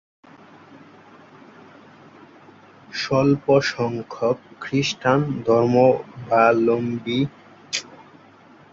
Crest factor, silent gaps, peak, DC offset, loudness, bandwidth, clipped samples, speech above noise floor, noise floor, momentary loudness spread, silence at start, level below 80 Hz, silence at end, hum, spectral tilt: 20 dB; none; -2 dBFS; under 0.1%; -21 LUFS; 7.8 kHz; under 0.1%; 30 dB; -49 dBFS; 12 LU; 0.75 s; -60 dBFS; 0.75 s; none; -5.5 dB/octave